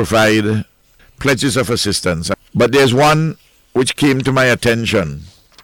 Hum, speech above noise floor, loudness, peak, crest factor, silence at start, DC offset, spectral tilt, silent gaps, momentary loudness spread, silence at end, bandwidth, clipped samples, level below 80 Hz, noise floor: none; 36 dB; -14 LUFS; -4 dBFS; 12 dB; 0 s; under 0.1%; -4.5 dB/octave; none; 10 LU; 0.35 s; 17.5 kHz; under 0.1%; -40 dBFS; -50 dBFS